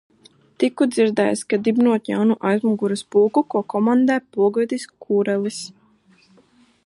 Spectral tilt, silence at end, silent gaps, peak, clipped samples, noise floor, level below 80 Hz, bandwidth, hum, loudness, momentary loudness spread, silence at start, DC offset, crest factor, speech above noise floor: -6 dB/octave; 1.15 s; none; -6 dBFS; under 0.1%; -56 dBFS; -70 dBFS; 11.5 kHz; none; -20 LUFS; 6 LU; 0.6 s; under 0.1%; 14 dB; 37 dB